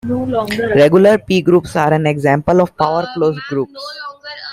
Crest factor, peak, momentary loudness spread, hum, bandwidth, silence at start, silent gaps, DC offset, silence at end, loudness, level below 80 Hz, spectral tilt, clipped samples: 12 dB; -2 dBFS; 16 LU; none; 15 kHz; 0.05 s; none; under 0.1%; 0 s; -14 LUFS; -46 dBFS; -7 dB/octave; under 0.1%